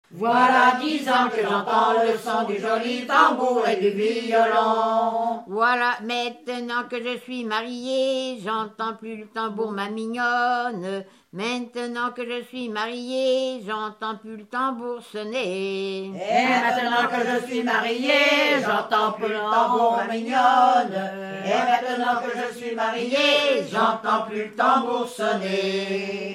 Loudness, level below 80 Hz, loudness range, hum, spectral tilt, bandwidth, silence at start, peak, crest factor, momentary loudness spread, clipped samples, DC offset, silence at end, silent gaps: -23 LUFS; -78 dBFS; 7 LU; none; -4 dB/octave; 14.5 kHz; 0.1 s; -4 dBFS; 18 dB; 12 LU; under 0.1%; under 0.1%; 0 s; none